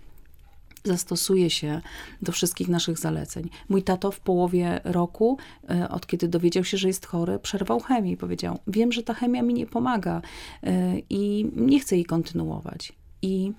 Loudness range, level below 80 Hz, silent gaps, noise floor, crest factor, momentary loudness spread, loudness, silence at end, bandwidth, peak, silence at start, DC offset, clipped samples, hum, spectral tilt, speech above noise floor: 1 LU; -50 dBFS; none; -48 dBFS; 16 dB; 11 LU; -26 LUFS; 0.05 s; 17 kHz; -10 dBFS; 0 s; under 0.1%; under 0.1%; none; -5.5 dB/octave; 23 dB